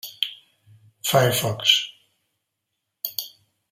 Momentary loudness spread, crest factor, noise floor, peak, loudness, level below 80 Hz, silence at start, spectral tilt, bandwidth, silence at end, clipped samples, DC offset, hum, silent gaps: 15 LU; 24 dB; -80 dBFS; -2 dBFS; -22 LUFS; -66 dBFS; 0.05 s; -3 dB/octave; 16 kHz; 0.45 s; under 0.1%; under 0.1%; none; none